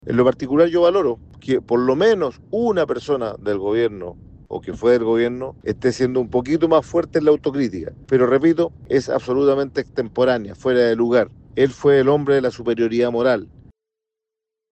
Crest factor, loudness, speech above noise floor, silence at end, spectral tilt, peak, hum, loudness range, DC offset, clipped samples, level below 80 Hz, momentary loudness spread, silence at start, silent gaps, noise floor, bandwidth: 16 dB; -19 LUFS; 66 dB; 1.25 s; -7 dB/octave; -4 dBFS; none; 3 LU; under 0.1%; under 0.1%; -50 dBFS; 8 LU; 0.05 s; none; -84 dBFS; 8.4 kHz